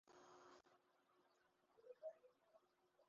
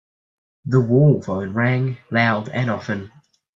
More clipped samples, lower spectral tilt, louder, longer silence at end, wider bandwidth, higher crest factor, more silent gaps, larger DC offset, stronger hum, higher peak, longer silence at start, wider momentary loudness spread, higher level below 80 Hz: neither; second, -2.5 dB/octave vs -8.5 dB/octave; second, -63 LUFS vs -20 LUFS; second, 0 s vs 0.5 s; about the same, 7.2 kHz vs 7.4 kHz; about the same, 22 dB vs 18 dB; neither; neither; neither; second, -46 dBFS vs -2 dBFS; second, 0.05 s vs 0.65 s; about the same, 9 LU vs 11 LU; second, under -90 dBFS vs -58 dBFS